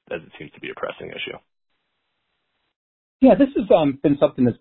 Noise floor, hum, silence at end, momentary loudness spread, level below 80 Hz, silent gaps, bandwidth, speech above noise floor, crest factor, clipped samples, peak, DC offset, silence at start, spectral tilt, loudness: -75 dBFS; none; 0.05 s; 18 LU; -52 dBFS; 2.76-3.20 s; 4.2 kHz; 55 dB; 20 dB; under 0.1%; -2 dBFS; under 0.1%; 0.1 s; -11.5 dB/octave; -17 LUFS